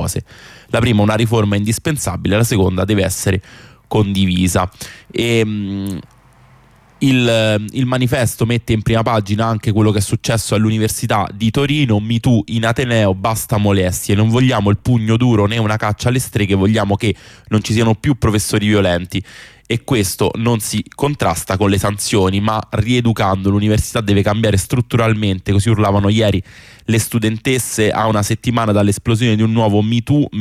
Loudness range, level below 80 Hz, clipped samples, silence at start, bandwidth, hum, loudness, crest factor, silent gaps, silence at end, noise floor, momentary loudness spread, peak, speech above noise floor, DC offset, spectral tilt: 3 LU; -38 dBFS; under 0.1%; 0 s; 15.5 kHz; none; -15 LUFS; 12 dB; none; 0 s; -47 dBFS; 5 LU; -4 dBFS; 32 dB; under 0.1%; -5.5 dB/octave